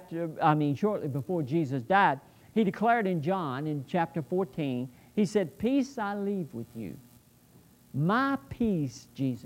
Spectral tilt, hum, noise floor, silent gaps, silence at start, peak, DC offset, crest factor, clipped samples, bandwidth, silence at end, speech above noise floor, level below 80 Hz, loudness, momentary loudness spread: -7.5 dB/octave; none; -59 dBFS; none; 0 s; -10 dBFS; under 0.1%; 18 dB; under 0.1%; 16 kHz; 0 s; 30 dB; -62 dBFS; -29 LUFS; 11 LU